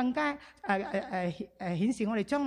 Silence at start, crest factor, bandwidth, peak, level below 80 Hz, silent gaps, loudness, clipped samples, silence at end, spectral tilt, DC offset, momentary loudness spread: 0 s; 16 dB; 11 kHz; -16 dBFS; -64 dBFS; none; -33 LUFS; under 0.1%; 0 s; -6.5 dB/octave; under 0.1%; 6 LU